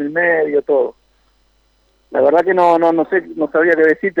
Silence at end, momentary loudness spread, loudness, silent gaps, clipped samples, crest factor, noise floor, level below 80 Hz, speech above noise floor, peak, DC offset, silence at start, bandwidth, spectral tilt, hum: 0 s; 7 LU; -14 LUFS; none; under 0.1%; 14 dB; -58 dBFS; -60 dBFS; 44 dB; -2 dBFS; under 0.1%; 0 s; 7.4 kHz; -7.5 dB/octave; none